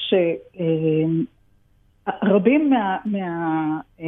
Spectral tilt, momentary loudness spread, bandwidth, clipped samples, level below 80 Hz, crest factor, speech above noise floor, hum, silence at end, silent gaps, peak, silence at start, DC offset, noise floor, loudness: -10 dB/octave; 10 LU; 3.9 kHz; under 0.1%; -62 dBFS; 18 dB; 38 dB; none; 0 s; none; -4 dBFS; 0 s; under 0.1%; -58 dBFS; -21 LUFS